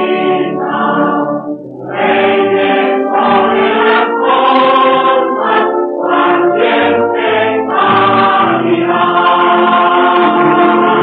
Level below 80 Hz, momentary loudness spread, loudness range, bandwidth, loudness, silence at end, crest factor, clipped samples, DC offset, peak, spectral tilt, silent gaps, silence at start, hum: -60 dBFS; 5 LU; 2 LU; 4.8 kHz; -10 LUFS; 0 s; 8 dB; under 0.1%; under 0.1%; -2 dBFS; -8 dB/octave; none; 0 s; none